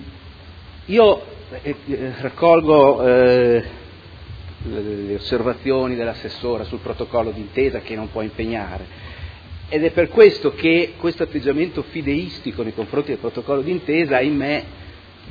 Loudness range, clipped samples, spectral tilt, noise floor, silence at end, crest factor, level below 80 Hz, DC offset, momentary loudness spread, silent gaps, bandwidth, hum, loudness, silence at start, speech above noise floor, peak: 8 LU; under 0.1%; -8 dB/octave; -40 dBFS; 0 s; 20 dB; -42 dBFS; under 0.1%; 22 LU; none; 5 kHz; none; -19 LUFS; 0 s; 21 dB; 0 dBFS